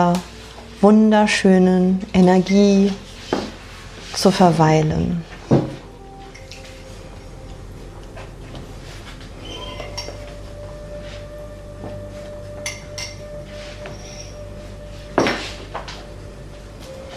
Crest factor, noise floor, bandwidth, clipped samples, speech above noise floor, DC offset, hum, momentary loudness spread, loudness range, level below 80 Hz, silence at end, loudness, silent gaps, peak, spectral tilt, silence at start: 18 dB; -38 dBFS; 13.5 kHz; under 0.1%; 23 dB; under 0.1%; none; 23 LU; 19 LU; -40 dBFS; 0 s; -18 LUFS; none; -2 dBFS; -6 dB/octave; 0 s